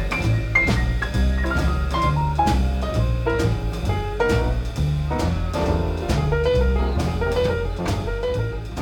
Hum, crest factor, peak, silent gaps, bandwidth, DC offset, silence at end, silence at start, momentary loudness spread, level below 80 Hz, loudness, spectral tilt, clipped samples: none; 14 dB; -6 dBFS; none; 17 kHz; under 0.1%; 0 s; 0 s; 5 LU; -24 dBFS; -22 LUFS; -6.5 dB/octave; under 0.1%